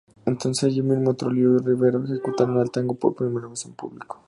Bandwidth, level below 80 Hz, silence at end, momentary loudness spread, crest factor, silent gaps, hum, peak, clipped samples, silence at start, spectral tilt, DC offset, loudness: 11.5 kHz; -64 dBFS; 0.15 s; 14 LU; 18 dB; none; none; -4 dBFS; under 0.1%; 0.25 s; -6.5 dB/octave; under 0.1%; -22 LUFS